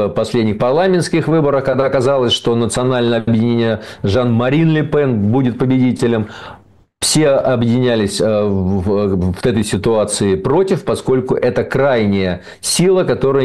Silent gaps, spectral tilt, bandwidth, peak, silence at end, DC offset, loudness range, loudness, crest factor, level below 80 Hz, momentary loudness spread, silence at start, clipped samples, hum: none; -5.5 dB/octave; 12.5 kHz; -6 dBFS; 0 s; 0.6%; 1 LU; -15 LUFS; 8 dB; -42 dBFS; 4 LU; 0 s; under 0.1%; none